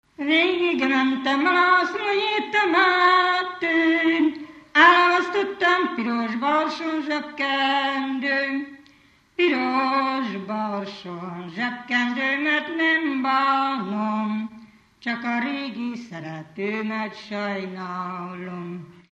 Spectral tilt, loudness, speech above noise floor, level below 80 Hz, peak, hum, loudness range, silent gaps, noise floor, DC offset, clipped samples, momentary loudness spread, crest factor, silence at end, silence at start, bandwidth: -5 dB/octave; -22 LUFS; 33 dB; -70 dBFS; -4 dBFS; none; 10 LU; none; -57 dBFS; under 0.1%; under 0.1%; 16 LU; 20 dB; 0.2 s; 0.2 s; 8.2 kHz